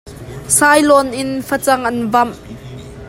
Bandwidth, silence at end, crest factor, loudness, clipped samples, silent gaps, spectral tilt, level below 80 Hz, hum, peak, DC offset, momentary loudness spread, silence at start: 16.5 kHz; 0 s; 16 dB; -13 LUFS; under 0.1%; none; -3 dB/octave; -42 dBFS; none; 0 dBFS; under 0.1%; 22 LU; 0.05 s